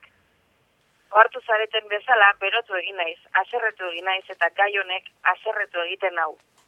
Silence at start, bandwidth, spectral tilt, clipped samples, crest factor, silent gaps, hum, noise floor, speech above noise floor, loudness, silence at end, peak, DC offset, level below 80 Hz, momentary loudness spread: 1.1 s; 9 kHz; -2 dB/octave; under 0.1%; 22 dB; none; none; -65 dBFS; 42 dB; -22 LUFS; 0.35 s; -2 dBFS; under 0.1%; -78 dBFS; 11 LU